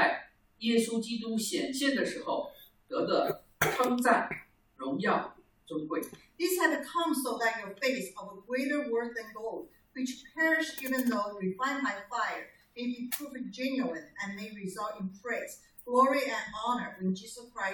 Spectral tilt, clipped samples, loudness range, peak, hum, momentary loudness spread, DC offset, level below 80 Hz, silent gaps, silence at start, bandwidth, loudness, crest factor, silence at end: -4 dB/octave; under 0.1%; 4 LU; -10 dBFS; none; 13 LU; under 0.1%; -68 dBFS; none; 0 s; over 20 kHz; -32 LUFS; 22 dB; 0 s